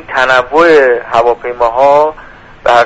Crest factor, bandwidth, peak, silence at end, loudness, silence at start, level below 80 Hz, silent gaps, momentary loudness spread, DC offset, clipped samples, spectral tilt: 10 dB; 9.6 kHz; 0 dBFS; 0 s; -9 LUFS; 0.1 s; -40 dBFS; none; 7 LU; under 0.1%; 0.3%; -4 dB/octave